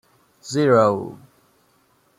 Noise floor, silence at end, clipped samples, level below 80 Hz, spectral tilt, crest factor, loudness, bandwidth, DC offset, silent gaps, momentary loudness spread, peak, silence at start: -61 dBFS; 1.05 s; under 0.1%; -66 dBFS; -6 dB/octave; 20 dB; -19 LUFS; 14.5 kHz; under 0.1%; none; 21 LU; -2 dBFS; 0.45 s